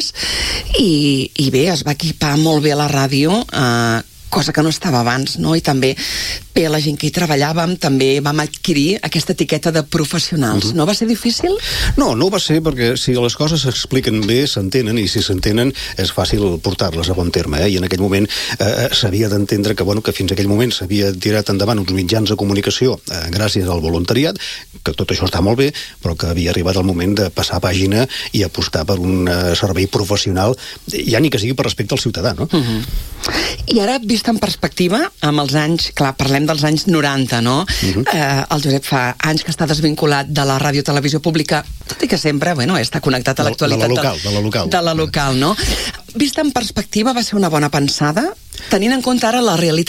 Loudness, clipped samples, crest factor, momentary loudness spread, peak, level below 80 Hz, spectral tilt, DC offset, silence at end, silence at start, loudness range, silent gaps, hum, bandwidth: -16 LUFS; under 0.1%; 14 dB; 4 LU; -2 dBFS; -34 dBFS; -5 dB/octave; under 0.1%; 0.05 s; 0 s; 2 LU; none; none; 17 kHz